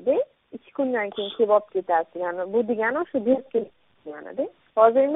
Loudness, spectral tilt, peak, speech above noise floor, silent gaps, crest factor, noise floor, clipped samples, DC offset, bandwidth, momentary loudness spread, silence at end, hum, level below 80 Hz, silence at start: -24 LUFS; -3 dB/octave; -4 dBFS; 21 dB; none; 20 dB; -44 dBFS; under 0.1%; under 0.1%; 3.9 kHz; 16 LU; 0 s; none; -70 dBFS; 0 s